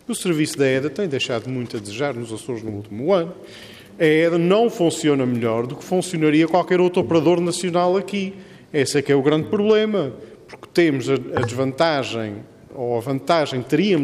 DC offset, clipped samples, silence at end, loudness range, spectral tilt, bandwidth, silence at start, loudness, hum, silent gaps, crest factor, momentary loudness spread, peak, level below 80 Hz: under 0.1%; under 0.1%; 0 s; 4 LU; -5.5 dB/octave; 15 kHz; 0.1 s; -20 LUFS; none; none; 16 dB; 12 LU; -4 dBFS; -62 dBFS